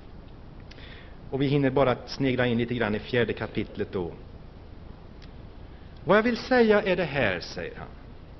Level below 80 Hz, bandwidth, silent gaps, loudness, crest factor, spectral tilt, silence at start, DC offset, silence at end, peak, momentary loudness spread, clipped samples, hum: -46 dBFS; 6.2 kHz; none; -26 LUFS; 20 dB; -4.5 dB/octave; 0 s; under 0.1%; 0 s; -8 dBFS; 25 LU; under 0.1%; none